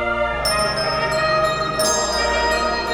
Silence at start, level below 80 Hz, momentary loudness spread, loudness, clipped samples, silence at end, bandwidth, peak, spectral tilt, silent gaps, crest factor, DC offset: 0 s; -36 dBFS; 2 LU; -19 LUFS; under 0.1%; 0 s; over 20 kHz; -6 dBFS; -2.5 dB/octave; none; 14 dB; under 0.1%